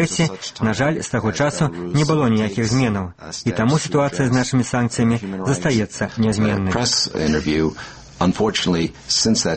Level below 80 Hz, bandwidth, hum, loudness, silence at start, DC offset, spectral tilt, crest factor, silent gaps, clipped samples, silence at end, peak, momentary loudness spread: -42 dBFS; 8.8 kHz; none; -19 LUFS; 0 s; under 0.1%; -5 dB/octave; 16 dB; none; under 0.1%; 0 s; -4 dBFS; 5 LU